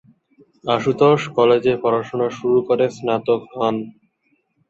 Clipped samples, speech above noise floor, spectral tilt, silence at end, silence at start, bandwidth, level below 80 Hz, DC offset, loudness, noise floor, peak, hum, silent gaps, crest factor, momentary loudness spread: under 0.1%; 48 dB; -6.5 dB/octave; 0.8 s; 0.65 s; 7.8 kHz; -60 dBFS; under 0.1%; -18 LUFS; -66 dBFS; -2 dBFS; none; none; 18 dB; 7 LU